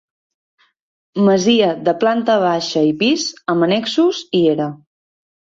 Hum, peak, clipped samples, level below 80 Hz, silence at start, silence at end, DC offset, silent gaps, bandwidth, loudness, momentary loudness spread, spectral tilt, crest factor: none; -2 dBFS; under 0.1%; -60 dBFS; 1.15 s; 0.85 s; under 0.1%; none; 7.8 kHz; -16 LUFS; 6 LU; -5 dB/octave; 14 dB